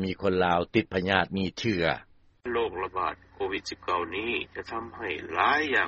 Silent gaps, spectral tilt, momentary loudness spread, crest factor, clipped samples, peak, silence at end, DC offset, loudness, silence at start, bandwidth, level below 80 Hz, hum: none; -3 dB/octave; 11 LU; 24 dB; under 0.1%; -4 dBFS; 0 s; under 0.1%; -28 LUFS; 0 s; 7.6 kHz; -56 dBFS; none